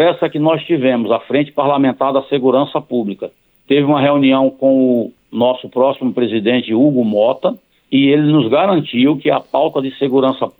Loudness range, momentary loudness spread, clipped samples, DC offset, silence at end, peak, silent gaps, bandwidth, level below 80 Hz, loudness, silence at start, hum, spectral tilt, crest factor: 2 LU; 7 LU; under 0.1%; under 0.1%; 0.1 s; -2 dBFS; none; 4.2 kHz; -62 dBFS; -14 LUFS; 0 s; none; -9.5 dB/octave; 12 dB